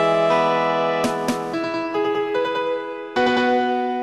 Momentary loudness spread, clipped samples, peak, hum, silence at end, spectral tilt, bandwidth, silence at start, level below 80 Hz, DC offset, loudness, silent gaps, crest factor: 7 LU; under 0.1%; -6 dBFS; none; 0 s; -5 dB/octave; 13 kHz; 0 s; -60 dBFS; under 0.1%; -21 LUFS; none; 14 dB